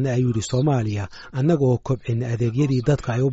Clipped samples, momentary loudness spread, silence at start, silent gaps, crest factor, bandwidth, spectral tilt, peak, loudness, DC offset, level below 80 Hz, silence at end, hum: under 0.1%; 6 LU; 0 s; none; 14 dB; 8 kHz; -8 dB/octave; -8 dBFS; -22 LUFS; under 0.1%; -46 dBFS; 0 s; none